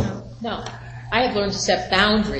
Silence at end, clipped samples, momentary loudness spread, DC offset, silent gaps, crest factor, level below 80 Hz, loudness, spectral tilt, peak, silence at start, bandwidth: 0 s; under 0.1%; 14 LU; under 0.1%; none; 18 dB; -40 dBFS; -21 LUFS; -4 dB/octave; -4 dBFS; 0 s; 8.8 kHz